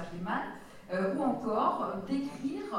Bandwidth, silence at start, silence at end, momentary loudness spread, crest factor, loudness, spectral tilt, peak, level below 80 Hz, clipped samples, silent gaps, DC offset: 13.5 kHz; 0 s; 0 s; 8 LU; 18 dB; -33 LUFS; -7 dB/octave; -16 dBFS; -62 dBFS; under 0.1%; none; under 0.1%